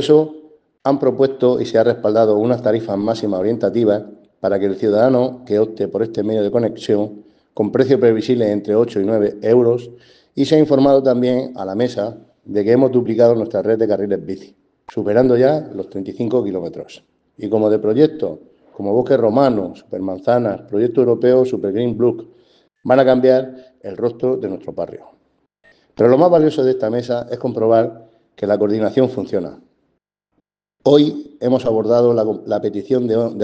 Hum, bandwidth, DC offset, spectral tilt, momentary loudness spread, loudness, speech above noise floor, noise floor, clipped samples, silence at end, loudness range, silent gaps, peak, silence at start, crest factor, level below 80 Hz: none; 8.4 kHz; under 0.1%; -8 dB/octave; 13 LU; -16 LUFS; 54 dB; -70 dBFS; under 0.1%; 0 s; 3 LU; none; 0 dBFS; 0 s; 16 dB; -58 dBFS